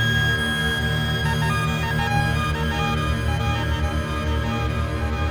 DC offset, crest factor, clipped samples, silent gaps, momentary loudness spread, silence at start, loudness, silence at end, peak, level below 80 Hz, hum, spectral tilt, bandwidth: under 0.1%; 14 dB; under 0.1%; none; 4 LU; 0 s; -22 LUFS; 0 s; -8 dBFS; -30 dBFS; none; -5 dB/octave; over 20 kHz